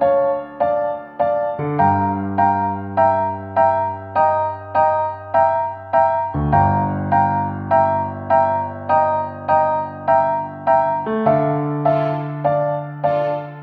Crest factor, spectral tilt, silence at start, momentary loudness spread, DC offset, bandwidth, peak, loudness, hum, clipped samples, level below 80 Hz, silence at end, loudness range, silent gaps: 16 dB; -10.5 dB/octave; 0 s; 5 LU; under 0.1%; 5 kHz; -2 dBFS; -18 LUFS; none; under 0.1%; -44 dBFS; 0 s; 1 LU; none